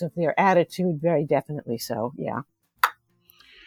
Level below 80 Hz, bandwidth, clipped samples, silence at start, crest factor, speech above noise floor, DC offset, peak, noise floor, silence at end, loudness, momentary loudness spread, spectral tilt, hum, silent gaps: -66 dBFS; over 20 kHz; under 0.1%; 0 s; 24 dB; 35 dB; under 0.1%; -2 dBFS; -59 dBFS; 0.75 s; -25 LUFS; 12 LU; -6 dB/octave; none; none